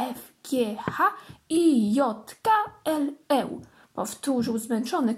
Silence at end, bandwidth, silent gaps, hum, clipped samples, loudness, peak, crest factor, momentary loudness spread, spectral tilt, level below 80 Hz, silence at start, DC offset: 0 s; 16 kHz; none; none; under 0.1%; -26 LUFS; -10 dBFS; 16 dB; 13 LU; -5 dB/octave; -68 dBFS; 0 s; under 0.1%